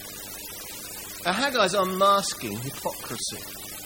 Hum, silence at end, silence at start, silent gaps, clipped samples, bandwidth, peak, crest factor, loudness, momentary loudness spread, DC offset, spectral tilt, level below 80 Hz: 50 Hz at -50 dBFS; 0 s; 0 s; none; under 0.1%; 17 kHz; -8 dBFS; 20 dB; -26 LUFS; 14 LU; under 0.1%; -2.5 dB/octave; -58 dBFS